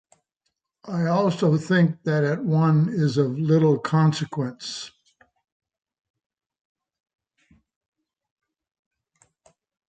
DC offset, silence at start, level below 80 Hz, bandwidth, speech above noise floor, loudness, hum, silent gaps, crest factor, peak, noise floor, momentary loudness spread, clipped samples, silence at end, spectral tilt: under 0.1%; 0.85 s; -68 dBFS; 8.8 kHz; 57 dB; -22 LUFS; none; none; 18 dB; -8 dBFS; -78 dBFS; 12 LU; under 0.1%; 5 s; -7.5 dB/octave